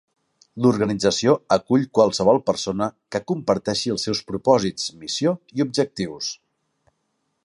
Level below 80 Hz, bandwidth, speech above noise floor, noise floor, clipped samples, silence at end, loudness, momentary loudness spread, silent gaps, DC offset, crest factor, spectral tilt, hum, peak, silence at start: -56 dBFS; 11.5 kHz; 52 dB; -73 dBFS; under 0.1%; 1.1 s; -21 LUFS; 9 LU; none; under 0.1%; 20 dB; -5 dB/octave; none; -2 dBFS; 0.55 s